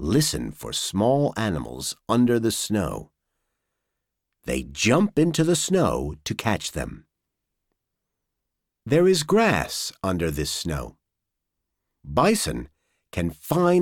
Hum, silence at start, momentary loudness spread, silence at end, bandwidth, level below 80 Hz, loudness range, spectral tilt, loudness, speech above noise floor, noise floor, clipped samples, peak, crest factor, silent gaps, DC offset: none; 0 s; 11 LU; 0 s; 18.5 kHz; -44 dBFS; 4 LU; -5 dB/octave; -23 LUFS; 60 dB; -83 dBFS; under 0.1%; -6 dBFS; 18 dB; none; under 0.1%